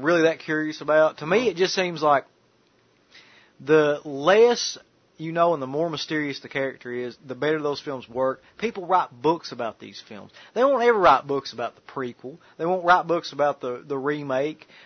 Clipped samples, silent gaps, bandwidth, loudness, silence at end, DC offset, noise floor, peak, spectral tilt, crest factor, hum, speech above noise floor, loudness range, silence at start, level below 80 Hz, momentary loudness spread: under 0.1%; none; 6.6 kHz; -23 LUFS; 0.3 s; under 0.1%; -62 dBFS; -6 dBFS; -4.5 dB/octave; 18 dB; none; 39 dB; 4 LU; 0 s; -66 dBFS; 14 LU